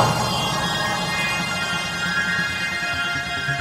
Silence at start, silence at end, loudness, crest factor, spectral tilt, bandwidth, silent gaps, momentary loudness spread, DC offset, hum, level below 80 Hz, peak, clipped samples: 0 s; 0 s; -22 LUFS; 20 dB; -3 dB/octave; 16.5 kHz; none; 2 LU; under 0.1%; none; -46 dBFS; -4 dBFS; under 0.1%